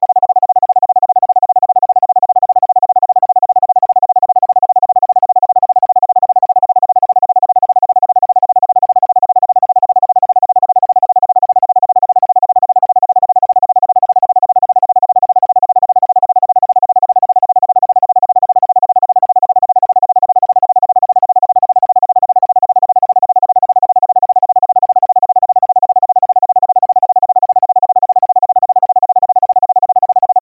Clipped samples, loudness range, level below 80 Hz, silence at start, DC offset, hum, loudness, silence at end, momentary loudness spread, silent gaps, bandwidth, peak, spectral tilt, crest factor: under 0.1%; 0 LU; -70 dBFS; 0 s; under 0.1%; none; -10 LUFS; 0 s; 0 LU; none; 1.4 kHz; -2 dBFS; -8.5 dB/octave; 8 dB